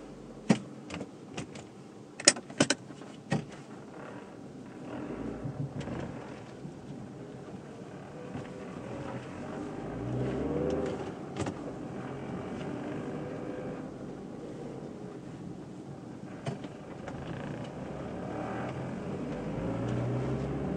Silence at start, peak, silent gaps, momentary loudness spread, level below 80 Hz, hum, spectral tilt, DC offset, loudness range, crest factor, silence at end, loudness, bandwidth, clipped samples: 0 s; -2 dBFS; none; 14 LU; -56 dBFS; none; -4 dB/octave; under 0.1%; 10 LU; 36 dB; 0 s; -36 LUFS; 10.5 kHz; under 0.1%